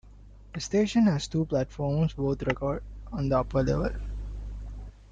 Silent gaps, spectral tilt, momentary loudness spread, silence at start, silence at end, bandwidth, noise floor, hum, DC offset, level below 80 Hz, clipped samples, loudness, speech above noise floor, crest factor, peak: none; -7 dB/octave; 16 LU; 0.05 s; 0.05 s; 9.2 kHz; -49 dBFS; none; under 0.1%; -40 dBFS; under 0.1%; -28 LUFS; 23 dB; 16 dB; -12 dBFS